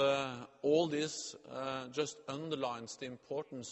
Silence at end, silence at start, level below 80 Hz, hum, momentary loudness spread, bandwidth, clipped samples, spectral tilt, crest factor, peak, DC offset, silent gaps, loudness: 0 s; 0 s; -78 dBFS; none; 11 LU; 8.4 kHz; under 0.1%; -4 dB/octave; 18 dB; -20 dBFS; under 0.1%; none; -38 LUFS